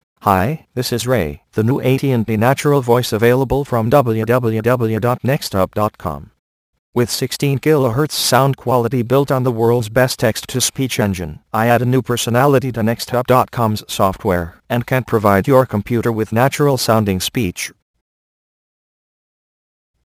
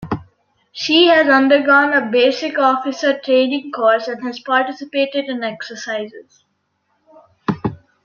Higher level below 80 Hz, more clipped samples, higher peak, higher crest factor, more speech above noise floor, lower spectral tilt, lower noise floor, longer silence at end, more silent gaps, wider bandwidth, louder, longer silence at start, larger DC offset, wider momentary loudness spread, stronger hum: first, -44 dBFS vs -56 dBFS; neither; about the same, 0 dBFS vs -2 dBFS; about the same, 16 dB vs 16 dB; first, over 74 dB vs 51 dB; about the same, -5.5 dB/octave vs -4.5 dB/octave; first, under -90 dBFS vs -67 dBFS; first, 2.35 s vs 0.3 s; first, 6.39-6.73 s, 6.79-6.93 s vs none; first, 15.5 kHz vs 7.2 kHz; about the same, -16 LUFS vs -16 LUFS; first, 0.25 s vs 0 s; neither; second, 7 LU vs 15 LU; neither